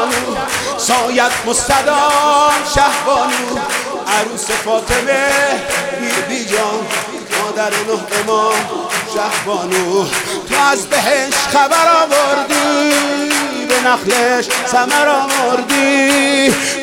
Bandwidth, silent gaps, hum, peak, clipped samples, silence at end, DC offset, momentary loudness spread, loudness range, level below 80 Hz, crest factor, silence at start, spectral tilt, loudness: 18.5 kHz; none; none; 0 dBFS; under 0.1%; 0 s; under 0.1%; 7 LU; 4 LU; -42 dBFS; 14 dB; 0 s; -2 dB/octave; -13 LUFS